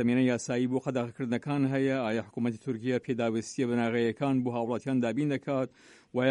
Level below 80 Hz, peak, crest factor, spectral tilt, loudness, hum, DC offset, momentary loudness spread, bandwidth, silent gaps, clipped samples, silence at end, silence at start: -70 dBFS; -14 dBFS; 14 dB; -6.5 dB/octave; -30 LUFS; none; under 0.1%; 5 LU; 10.5 kHz; none; under 0.1%; 0 s; 0 s